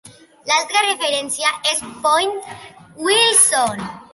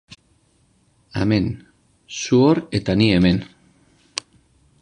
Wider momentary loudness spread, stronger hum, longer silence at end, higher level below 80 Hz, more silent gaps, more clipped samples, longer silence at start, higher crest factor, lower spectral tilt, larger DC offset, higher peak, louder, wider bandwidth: about the same, 16 LU vs 16 LU; neither; second, 0.1 s vs 1.35 s; second, -60 dBFS vs -42 dBFS; neither; neither; second, 0.05 s vs 1.15 s; about the same, 20 dB vs 20 dB; second, 0 dB/octave vs -6 dB/octave; neither; about the same, 0 dBFS vs -2 dBFS; first, -16 LUFS vs -19 LUFS; first, 14 kHz vs 10.5 kHz